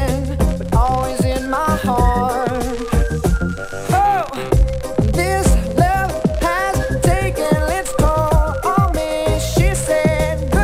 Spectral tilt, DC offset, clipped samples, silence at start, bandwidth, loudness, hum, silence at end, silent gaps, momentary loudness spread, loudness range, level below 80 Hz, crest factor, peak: -6 dB/octave; under 0.1%; under 0.1%; 0 s; 16 kHz; -17 LUFS; none; 0 s; none; 4 LU; 1 LU; -22 dBFS; 16 dB; 0 dBFS